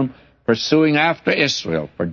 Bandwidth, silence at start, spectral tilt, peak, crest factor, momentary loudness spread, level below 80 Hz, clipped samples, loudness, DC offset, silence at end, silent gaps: 7.2 kHz; 0 s; -5 dB/octave; -2 dBFS; 16 dB; 10 LU; -54 dBFS; under 0.1%; -18 LUFS; under 0.1%; 0 s; none